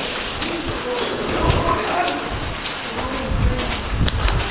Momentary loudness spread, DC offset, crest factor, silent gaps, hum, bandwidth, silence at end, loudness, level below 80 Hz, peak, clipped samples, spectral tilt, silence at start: 6 LU; under 0.1%; 18 dB; none; none; 4 kHz; 0 s; -22 LUFS; -26 dBFS; -2 dBFS; under 0.1%; -10 dB/octave; 0 s